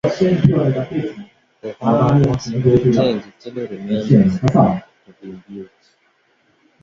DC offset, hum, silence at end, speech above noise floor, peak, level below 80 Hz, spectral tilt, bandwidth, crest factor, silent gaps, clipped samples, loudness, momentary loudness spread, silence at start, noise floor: under 0.1%; none; 1.2 s; 44 dB; 0 dBFS; -44 dBFS; -8.5 dB/octave; 7.4 kHz; 18 dB; none; under 0.1%; -16 LUFS; 21 LU; 0.05 s; -60 dBFS